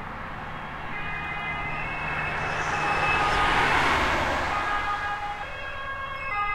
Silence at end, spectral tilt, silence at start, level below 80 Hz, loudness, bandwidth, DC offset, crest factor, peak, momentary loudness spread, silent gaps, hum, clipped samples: 0 s; -4 dB/octave; 0 s; -40 dBFS; -26 LUFS; 16.5 kHz; under 0.1%; 18 dB; -10 dBFS; 12 LU; none; none; under 0.1%